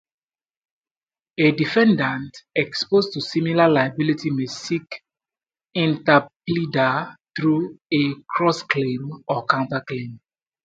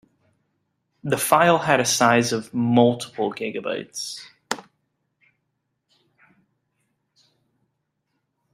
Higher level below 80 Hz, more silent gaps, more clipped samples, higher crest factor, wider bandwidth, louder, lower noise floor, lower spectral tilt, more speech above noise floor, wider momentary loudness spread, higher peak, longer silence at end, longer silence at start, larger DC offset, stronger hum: about the same, -64 dBFS vs -66 dBFS; first, 6.36-6.40 s vs none; neither; about the same, 22 dB vs 22 dB; second, 7.8 kHz vs 16 kHz; about the same, -21 LUFS vs -21 LUFS; first, under -90 dBFS vs -76 dBFS; first, -6 dB/octave vs -4 dB/octave; first, over 69 dB vs 56 dB; about the same, 13 LU vs 15 LU; about the same, 0 dBFS vs -2 dBFS; second, 0.5 s vs 3.9 s; first, 1.4 s vs 1.05 s; neither; neither